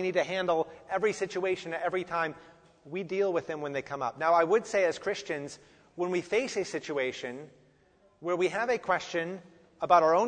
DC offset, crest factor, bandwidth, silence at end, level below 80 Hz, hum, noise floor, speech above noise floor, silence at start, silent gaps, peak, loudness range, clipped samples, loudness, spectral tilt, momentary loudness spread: under 0.1%; 22 dB; 9.6 kHz; 0 s; -70 dBFS; none; -64 dBFS; 35 dB; 0 s; none; -10 dBFS; 3 LU; under 0.1%; -30 LUFS; -4.5 dB/octave; 14 LU